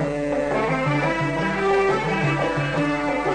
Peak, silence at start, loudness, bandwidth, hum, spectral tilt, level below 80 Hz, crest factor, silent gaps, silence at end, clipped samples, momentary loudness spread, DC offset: -12 dBFS; 0 s; -22 LUFS; 9.6 kHz; none; -6.5 dB/octave; -44 dBFS; 10 dB; none; 0 s; under 0.1%; 3 LU; under 0.1%